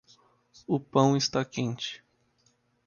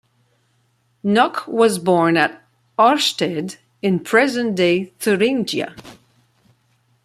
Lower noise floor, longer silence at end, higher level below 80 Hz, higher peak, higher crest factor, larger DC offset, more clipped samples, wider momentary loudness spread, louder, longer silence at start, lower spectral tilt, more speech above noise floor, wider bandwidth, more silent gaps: first, -69 dBFS vs -63 dBFS; second, 0.9 s vs 1.1 s; about the same, -66 dBFS vs -64 dBFS; second, -8 dBFS vs -2 dBFS; about the same, 22 dB vs 18 dB; neither; neither; first, 17 LU vs 10 LU; second, -28 LUFS vs -18 LUFS; second, 0.7 s vs 1.05 s; about the same, -5.5 dB/octave vs -4.5 dB/octave; second, 42 dB vs 46 dB; second, 7.2 kHz vs 15.5 kHz; neither